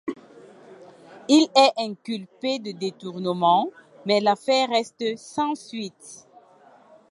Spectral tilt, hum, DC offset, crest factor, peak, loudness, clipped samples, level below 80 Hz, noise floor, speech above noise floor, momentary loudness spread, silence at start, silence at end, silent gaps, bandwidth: -4 dB/octave; none; under 0.1%; 22 dB; -2 dBFS; -23 LUFS; under 0.1%; -76 dBFS; -53 dBFS; 31 dB; 18 LU; 0.05 s; 0.95 s; none; 11.5 kHz